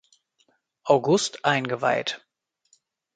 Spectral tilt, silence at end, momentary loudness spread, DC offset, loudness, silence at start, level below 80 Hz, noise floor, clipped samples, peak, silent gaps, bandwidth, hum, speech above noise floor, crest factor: -4 dB/octave; 1 s; 14 LU; under 0.1%; -23 LUFS; 0.85 s; -72 dBFS; -68 dBFS; under 0.1%; -4 dBFS; none; 9.4 kHz; none; 46 dB; 22 dB